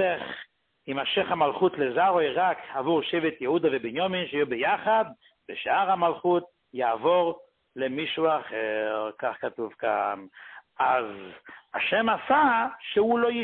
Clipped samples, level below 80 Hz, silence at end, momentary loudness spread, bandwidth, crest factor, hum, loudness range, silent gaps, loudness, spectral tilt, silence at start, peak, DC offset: under 0.1%; -68 dBFS; 0 s; 14 LU; 4.4 kHz; 16 dB; none; 4 LU; none; -26 LUFS; -9 dB/octave; 0 s; -10 dBFS; under 0.1%